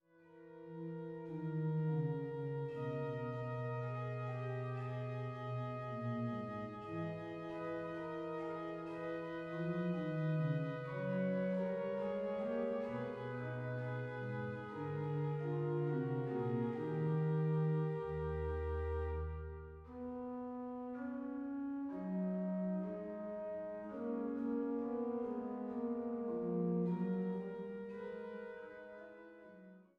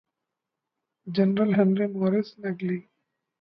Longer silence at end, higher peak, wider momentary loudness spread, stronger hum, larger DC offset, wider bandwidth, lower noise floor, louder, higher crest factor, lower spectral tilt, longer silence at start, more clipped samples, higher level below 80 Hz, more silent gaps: second, 0.15 s vs 0.6 s; second, -26 dBFS vs -10 dBFS; about the same, 9 LU vs 11 LU; neither; neither; about the same, 5.4 kHz vs 5.6 kHz; second, -61 dBFS vs -85 dBFS; second, -41 LUFS vs -25 LUFS; about the same, 14 dB vs 18 dB; about the same, -10 dB/octave vs -10.5 dB/octave; second, 0.2 s vs 1.05 s; neither; first, -58 dBFS vs -72 dBFS; neither